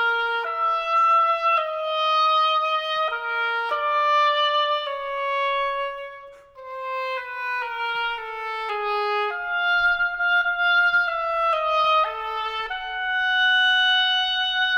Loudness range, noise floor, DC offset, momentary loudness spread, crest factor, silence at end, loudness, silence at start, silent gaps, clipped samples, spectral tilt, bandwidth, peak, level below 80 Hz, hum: 7 LU; -43 dBFS; under 0.1%; 10 LU; 12 dB; 0 s; -21 LUFS; 0 s; none; under 0.1%; 0 dB/octave; 15.5 kHz; -12 dBFS; -56 dBFS; none